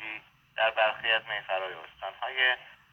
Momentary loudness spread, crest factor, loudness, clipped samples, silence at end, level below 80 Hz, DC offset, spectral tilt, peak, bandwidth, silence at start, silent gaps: 15 LU; 20 dB; -28 LUFS; under 0.1%; 0.2 s; -72 dBFS; under 0.1%; -3 dB/octave; -12 dBFS; 6.6 kHz; 0 s; none